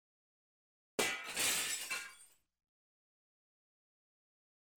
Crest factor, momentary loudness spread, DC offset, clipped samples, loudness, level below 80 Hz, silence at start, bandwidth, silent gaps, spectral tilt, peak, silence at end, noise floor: 24 dB; 10 LU; under 0.1%; under 0.1%; -36 LUFS; -78 dBFS; 1 s; over 20 kHz; none; 0.5 dB/octave; -20 dBFS; 2.5 s; -63 dBFS